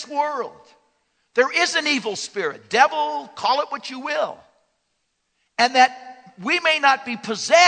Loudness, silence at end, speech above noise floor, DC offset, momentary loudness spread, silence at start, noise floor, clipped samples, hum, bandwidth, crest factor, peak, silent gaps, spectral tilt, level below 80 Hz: -20 LUFS; 0 s; 52 dB; under 0.1%; 12 LU; 0 s; -72 dBFS; under 0.1%; none; 9.4 kHz; 20 dB; -2 dBFS; none; -1.5 dB/octave; -76 dBFS